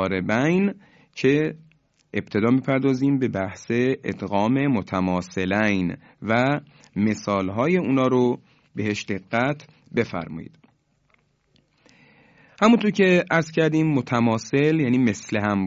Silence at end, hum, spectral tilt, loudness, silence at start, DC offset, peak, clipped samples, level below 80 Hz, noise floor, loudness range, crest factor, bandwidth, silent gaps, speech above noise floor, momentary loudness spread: 0 s; none; -6.5 dB/octave; -22 LUFS; 0 s; under 0.1%; -4 dBFS; under 0.1%; -54 dBFS; -65 dBFS; 8 LU; 18 dB; 7.8 kHz; none; 43 dB; 11 LU